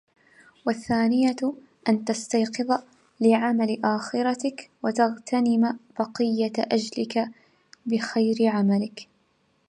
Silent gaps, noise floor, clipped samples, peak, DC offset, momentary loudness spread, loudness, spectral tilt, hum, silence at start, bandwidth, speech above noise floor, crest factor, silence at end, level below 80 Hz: none; -67 dBFS; under 0.1%; -8 dBFS; under 0.1%; 9 LU; -25 LUFS; -5.5 dB/octave; none; 0.65 s; 11 kHz; 43 dB; 18 dB; 0.65 s; -70 dBFS